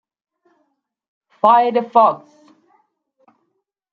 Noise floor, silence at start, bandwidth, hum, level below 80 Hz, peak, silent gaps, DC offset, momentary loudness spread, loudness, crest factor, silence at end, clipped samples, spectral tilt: -72 dBFS; 1.45 s; 5.6 kHz; none; -74 dBFS; 0 dBFS; none; under 0.1%; 5 LU; -15 LUFS; 20 dB; 1.75 s; under 0.1%; -7 dB/octave